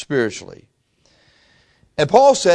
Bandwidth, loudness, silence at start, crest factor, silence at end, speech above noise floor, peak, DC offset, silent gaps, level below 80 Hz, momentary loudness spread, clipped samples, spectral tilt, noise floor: 10.5 kHz; -16 LUFS; 0 s; 18 dB; 0 s; 44 dB; 0 dBFS; under 0.1%; none; -56 dBFS; 19 LU; under 0.1%; -4 dB/octave; -59 dBFS